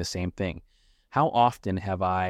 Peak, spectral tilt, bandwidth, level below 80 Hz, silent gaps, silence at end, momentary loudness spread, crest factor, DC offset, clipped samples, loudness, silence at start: -8 dBFS; -5.5 dB/octave; 15.5 kHz; -52 dBFS; none; 0 s; 11 LU; 18 dB; under 0.1%; under 0.1%; -27 LUFS; 0 s